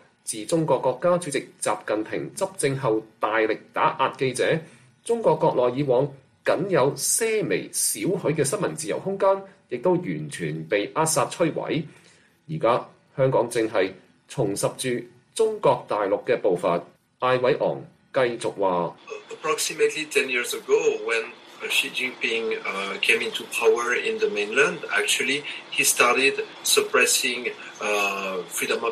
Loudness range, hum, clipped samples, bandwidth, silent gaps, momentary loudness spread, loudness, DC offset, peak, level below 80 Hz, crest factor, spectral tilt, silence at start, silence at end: 4 LU; none; under 0.1%; 15 kHz; none; 9 LU; -23 LUFS; under 0.1%; -4 dBFS; -68 dBFS; 20 dB; -3 dB/octave; 0.25 s; 0 s